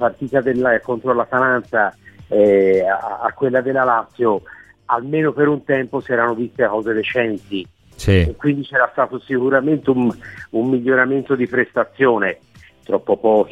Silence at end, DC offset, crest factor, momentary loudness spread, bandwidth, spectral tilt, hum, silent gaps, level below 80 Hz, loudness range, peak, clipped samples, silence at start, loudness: 0 s; under 0.1%; 16 dB; 7 LU; 11.5 kHz; -7.5 dB/octave; none; none; -40 dBFS; 2 LU; -2 dBFS; under 0.1%; 0 s; -18 LUFS